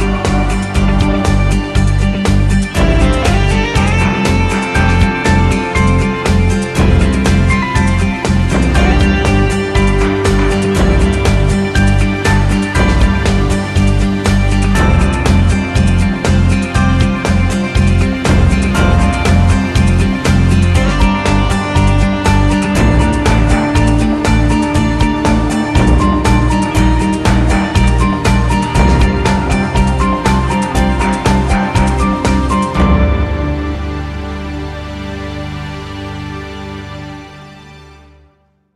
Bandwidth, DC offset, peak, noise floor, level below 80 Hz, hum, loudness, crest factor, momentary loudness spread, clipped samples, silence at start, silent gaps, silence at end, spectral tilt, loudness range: 12.5 kHz; under 0.1%; 0 dBFS; -53 dBFS; -16 dBFS; none; -12 LUFS; 12 dB; 7 LU; under 0.1%; 0 s; none; 0.9 s; -6 dB/octave; 4 LU